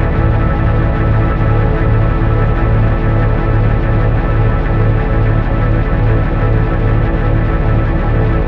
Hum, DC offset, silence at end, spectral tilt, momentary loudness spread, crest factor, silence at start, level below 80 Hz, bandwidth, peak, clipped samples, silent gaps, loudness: none; under 0.1%; 0 s; -10.5 dB/octave; 1 LU; 10 dB; 0 s; -14 dBFS; 4.7 kHz; 0 dBFS; under 0.1%; none; -14 LUFS